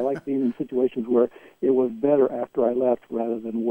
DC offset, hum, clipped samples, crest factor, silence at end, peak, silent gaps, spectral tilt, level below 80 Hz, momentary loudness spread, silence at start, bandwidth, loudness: under 0.1%; none; under 0.1%; 16 dB; 0 s; -8 dBFS; none; -9.5 dB/octave; -66 dBFS; 6 LU; 0 s; 3.5 kHz; -24 LUFS